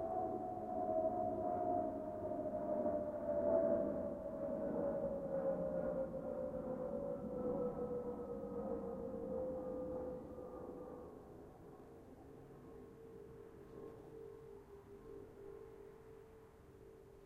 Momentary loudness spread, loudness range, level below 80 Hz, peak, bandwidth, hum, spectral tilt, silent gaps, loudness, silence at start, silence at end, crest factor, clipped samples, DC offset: 19 LU; 17 LU; -66 dBFS; -24 dBFS; 15 kHz; none; -9.5 dB/octave; none; -42 LUFS; 0 s; 0 s; 18 dB; under 0.1%; under 0.1%